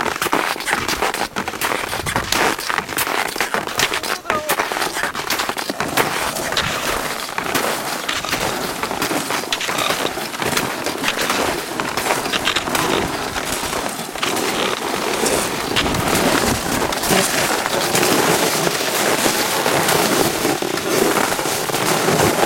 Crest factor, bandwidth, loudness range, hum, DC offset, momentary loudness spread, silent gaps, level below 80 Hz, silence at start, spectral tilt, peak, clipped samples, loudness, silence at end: 20 dB; 17 kHz; 4 LU; none; under 0.1%; 6 LU; none; -44 dBFS; 0 s; -2.5 dB/octave; 0 dBFS; under 0.1%; -18 LUFS; 0 s